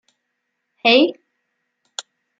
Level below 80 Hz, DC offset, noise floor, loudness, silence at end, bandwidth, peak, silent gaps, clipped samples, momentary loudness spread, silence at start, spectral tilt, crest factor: -78 dBFS; under 0.1%; -75 dBFS; -16 LUFS; 0.4 s; 9.2 kHz; -2 dBFS; none; under 0.1%; 20 LU; 0.85 s; -2.5 dB/octave; 20 dB